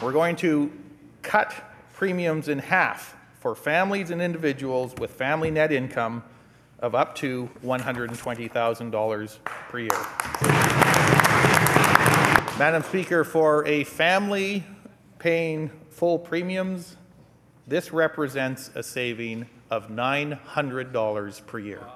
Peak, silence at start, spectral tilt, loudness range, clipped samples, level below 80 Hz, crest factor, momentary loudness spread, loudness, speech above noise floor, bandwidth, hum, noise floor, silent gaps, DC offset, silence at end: 0 dBFS; 0 s; -5 dB/octave; 9 LU; under 0.1%; -54 dBFS; 24 dB; 15 LU; -24 LUFS; 29 dB; 15 kHz; none; -54 dBFS; none; under 0.1%; 0 s